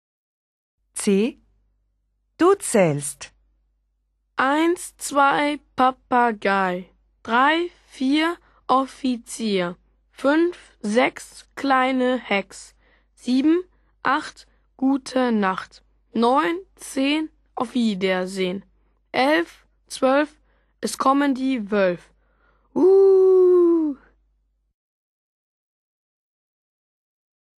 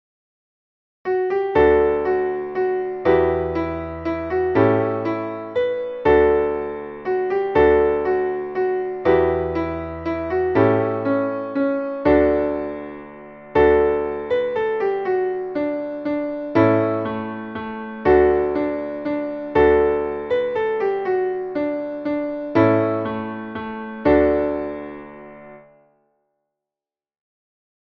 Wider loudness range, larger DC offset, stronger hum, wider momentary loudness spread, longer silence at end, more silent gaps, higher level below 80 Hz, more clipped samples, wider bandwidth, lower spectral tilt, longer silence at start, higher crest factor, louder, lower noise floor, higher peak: about the same, 5 LU vs 3 LU; neither; neither; about the same, 15 LU vs 13 LU; first, 3.65 s vs 2.4 s; neither; second, -60 dBFS vs -42 dBFS; neither; first, 13 kHz vs 5.8 kHz; second, -4.5 dB/octave vs -9.5 dB/octave; about the same, 0.95 s vs 1.05 s; about the same, 18 dB vs 18 dB; about the same, -21 LUFS vs -20 LUFS; second, -71 dBFS vs under -90 dBFS; about the same, -4 dBFS vs -4 dBFS